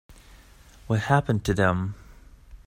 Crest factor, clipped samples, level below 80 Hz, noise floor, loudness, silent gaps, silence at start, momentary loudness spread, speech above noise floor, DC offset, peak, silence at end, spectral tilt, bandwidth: 22 dB; under 0.1%; -46 dBFS; -51 dBFS; -25 LUFS; none; 0.1 s; 11 LU; 28 dB; under 0.1%; -6 dBFS; 0.1 s; -6.5 dB/octave; 16 kHz